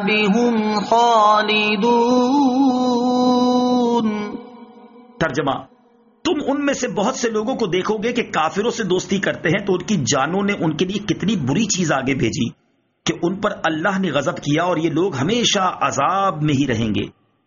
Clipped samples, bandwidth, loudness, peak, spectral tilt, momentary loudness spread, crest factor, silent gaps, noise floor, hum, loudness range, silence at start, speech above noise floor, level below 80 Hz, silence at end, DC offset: under 0.1%; 7.4 kHz; -18 LUFS; -4 dBFS; -4 dB/octave; 7 LU; 14 dB; none; -54 dBFS; none; 6 LU; 0 s; 36 dB; -52 dBFS; 0.35 s; under 0.1%